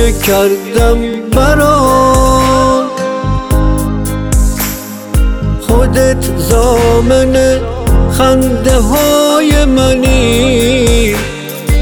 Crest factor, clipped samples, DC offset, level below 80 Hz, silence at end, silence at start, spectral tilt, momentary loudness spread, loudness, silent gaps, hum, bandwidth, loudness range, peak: 10 dB; under 0.1%; under 0.1%; -14 dBFS; 0 s; 0 s; -5 dB/octave; 8 LU; -10 LUFS; none; none; 18.5 kHz; 4 LU; 0 dBFS